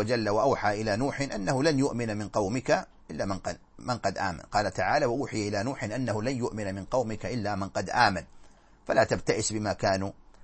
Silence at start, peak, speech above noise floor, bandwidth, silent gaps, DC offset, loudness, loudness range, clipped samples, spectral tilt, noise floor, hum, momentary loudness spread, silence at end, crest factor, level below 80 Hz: 0 s; -6 dBFS; 25 dB; 8.8 kHz; none; under 0.1%; -29 LUFS; 2 LU; under 0.1%; -5 dB/octave; -53 dBFS; none; 9 LU; 0 s; 22 dB; -50 dBFS